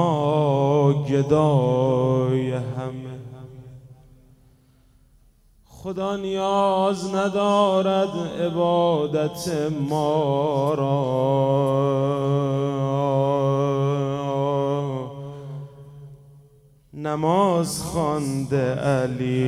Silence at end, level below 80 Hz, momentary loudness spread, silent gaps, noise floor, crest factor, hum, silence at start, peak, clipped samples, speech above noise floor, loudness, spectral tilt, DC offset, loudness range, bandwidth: 0 s; -56 dBFS; 13 LU; none; -56 dBFS; 16 dB; none; 0 s; -6 dBFS; under 0.1%; 35 dB; -22 LUFS; -7 dB/octave; under 0.1%; 7 LU; 14 kHz